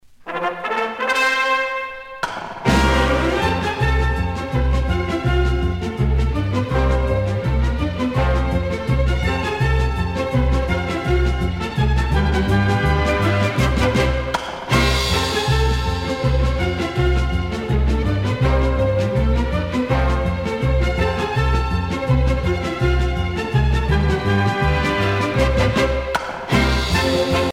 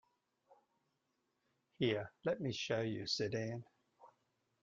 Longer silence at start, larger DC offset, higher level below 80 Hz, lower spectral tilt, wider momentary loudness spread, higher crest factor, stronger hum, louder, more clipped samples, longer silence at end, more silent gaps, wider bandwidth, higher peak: second, 0.2 s vs 0.5 s; neither; first, -22 dBFS vs -76 dBFS; about the same, -6 dB/octave vs -5 dB/octave; about the same, 5 LU vs 5 LU; second, 16 dB vs 22 dB; neither; first, -19 LUFS vs -40 LUFS; neither; second, 0 s vs 0.55 s; neither; first, 13.5 kHz vs 7.8 kHz; first, -2 dBFS vs -22 dBFS